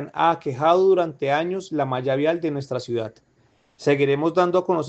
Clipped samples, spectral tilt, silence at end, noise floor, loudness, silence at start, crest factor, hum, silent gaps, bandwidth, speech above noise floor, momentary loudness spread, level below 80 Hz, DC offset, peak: under 0.1%; -6.5 dB/octave; 0 s; -61 dBFS; -22 LUFS; 0 s; 18 dB; none; none; 8.2 kHz; 40 dB; 9 LU; -66 dBFS; under 0.1%; -4 dBFS